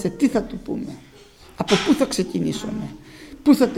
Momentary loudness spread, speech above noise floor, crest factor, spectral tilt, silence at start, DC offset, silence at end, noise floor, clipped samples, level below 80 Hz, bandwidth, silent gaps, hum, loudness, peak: 17 LU; 26 dB; 20 dB; -5 dB/octave; 0 s; under 0.1%; 0 s; -47 dBFS; under 0.1%; -48 dBFS; 16 kHz; none; none; -22 LUFS; -2 dBFS